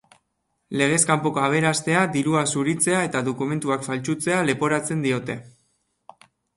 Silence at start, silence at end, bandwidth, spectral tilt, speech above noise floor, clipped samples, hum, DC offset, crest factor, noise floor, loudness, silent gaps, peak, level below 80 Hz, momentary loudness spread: 0.7 s; 1.1 s; 11.5 kHz; -4.5 dB/octave; 52 dB; under 0.1%; none; under 0.1%; 18 dB; -74 dBFS; -22 LUFS; none; -4 dBFS; -62 dBFS; 7 LU